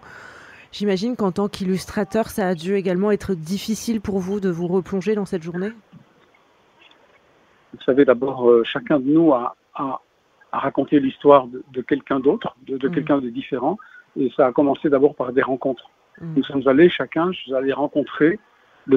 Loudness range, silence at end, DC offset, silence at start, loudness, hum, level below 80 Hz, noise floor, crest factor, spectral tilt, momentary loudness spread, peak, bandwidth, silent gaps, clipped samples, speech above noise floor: 6 LU; 0 s; under 0.1%; 0.05 s; -20 LUFS; none; -54 dBFS; -57 dBFS; 20 dB; -6.5 dB/octave; 13 LU; 0 dBFS; 15.5 kHz; none; under 0.1%; 37 dB